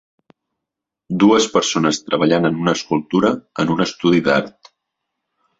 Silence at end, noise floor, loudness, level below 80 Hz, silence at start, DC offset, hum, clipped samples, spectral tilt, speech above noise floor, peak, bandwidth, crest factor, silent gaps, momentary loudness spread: 1.1 s; -83 dBFS; -17 LUFS; -56 dBFS; 1.1 s; under 0.1%; none; under 0.1%; -5 dB/octave; 67 dB; -2 dBFS; 8 kHz; 18 dB; none; 6 LU